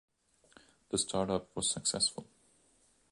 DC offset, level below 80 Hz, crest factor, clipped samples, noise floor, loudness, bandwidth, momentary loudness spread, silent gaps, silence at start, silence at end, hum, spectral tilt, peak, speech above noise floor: under 0.1%; -64 dBFS; 22 dB; under 0.1%; -70 dBFS; -33 LUFS; 11.5 kHz; 6 LU; none; 0.9 s; 0.9 s; none; -2.5 dB/octave; -16 dBFS; 35 dB